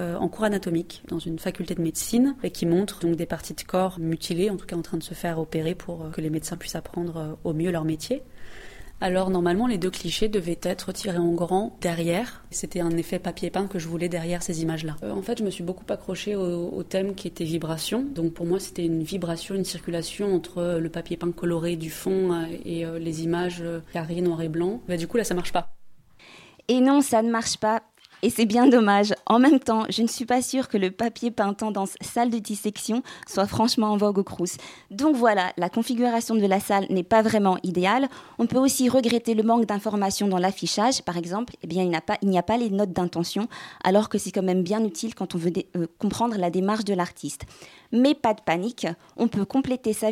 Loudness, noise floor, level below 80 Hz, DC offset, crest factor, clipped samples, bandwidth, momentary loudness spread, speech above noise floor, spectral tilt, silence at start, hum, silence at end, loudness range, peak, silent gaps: -25 LUFS; -50 dBFS; -50 dBFS; under 0.1%; 18 dB; under 0.1%; 16.5 kHz; 10 LU; 25 dB; -5 dB/octave; 0 s; none; 0 s; 7 LU; -6 dBFS; none